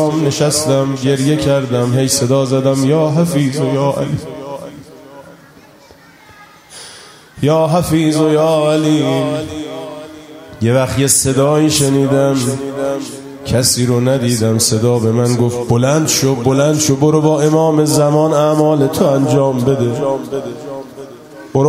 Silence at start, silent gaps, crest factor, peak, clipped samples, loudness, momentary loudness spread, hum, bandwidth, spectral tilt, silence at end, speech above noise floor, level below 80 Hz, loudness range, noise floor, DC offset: 0 s; none; 14 dB; 0 dBFS; under 0.1%; -13 LUFS; 16 LU; none; 16 kHz; -5.5 dB/octave; 0 s; 30 dB; -44 dBFS; 7 LU; -42 dBFS; under 0.1%